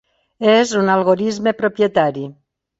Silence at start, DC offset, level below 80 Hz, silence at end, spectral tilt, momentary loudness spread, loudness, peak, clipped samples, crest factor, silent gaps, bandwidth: 0.4 s; under 0.1%; -60 dBFS; 0.5 s; -5 dB/octave; 7 LU; -16 LUFS; -2 dBFS; under 0.1%; 16 dB; none; 8 kHz